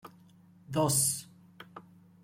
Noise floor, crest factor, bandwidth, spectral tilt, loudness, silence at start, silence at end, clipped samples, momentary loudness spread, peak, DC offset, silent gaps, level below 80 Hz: -59 dBFS; 20 dB; 16.5 kHz; -3.5 dB/octave; -29 LUFS; 0.05 s; 0.4 s; under 0.1%; 25 LU; -14 dBFS; under 0.1%; none; -66 dBFS